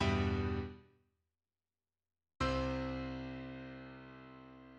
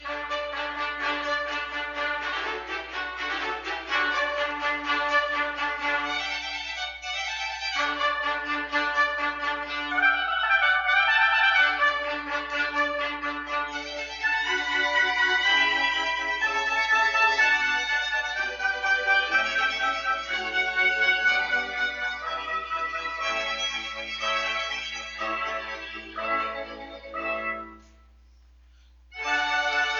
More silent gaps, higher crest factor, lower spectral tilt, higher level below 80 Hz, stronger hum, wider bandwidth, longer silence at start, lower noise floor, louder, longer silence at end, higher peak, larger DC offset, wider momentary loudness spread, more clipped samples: neither; about the same, 18 dB vs 18 dB; first, -6.5 dB/octave vs -1 dB/octave; about the same, -50 dBFS vs -54 dBFS; neither; first, 9.4 kHz vs 7.6 kHz; about the same, 0 s vs 0 s; first, under -90 dBFS vs -54 dBFS; second, -39 LUFS vs -25 LUFS; about the same, 0 s vs 0 s; second, -22 dBFS vs -10 dBFS; neither; first, 19 LU vs 11 LU; neither